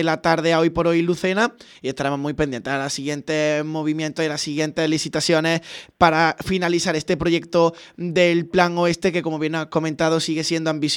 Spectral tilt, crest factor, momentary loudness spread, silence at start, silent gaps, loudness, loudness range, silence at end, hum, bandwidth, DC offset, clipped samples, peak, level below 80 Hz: -4.5 dB/octave; 20 dB; 6 LU; 0 s; none; -21 LUFS; 3 LU; 0 s; none; 16.5 kHz; under 0.1%; under 0.1%; 0 dBFS; -50 dBFS